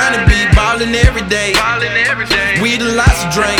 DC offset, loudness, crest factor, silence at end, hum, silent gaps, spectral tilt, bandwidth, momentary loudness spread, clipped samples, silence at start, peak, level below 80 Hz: under 0.1%; -12 LUFS; 12 dB; 0 s; none; none; -4 dB/octave; 18.5 kHz; 3 LU; 0.4%; 0 s; 0 dBFS; -18 dBFS